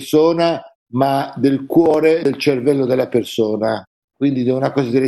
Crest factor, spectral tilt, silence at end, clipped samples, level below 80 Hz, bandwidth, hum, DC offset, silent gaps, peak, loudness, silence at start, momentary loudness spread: 14 dB; -6.5 dB/octave; 0 s; under 0.1%; -56 dBFS; 12.5 kHz; none; under 0.1%; 0.75-0.86 s, 3.87-4.08 s; -2 dBFS; -17 LUFS; 0 s; 7 LU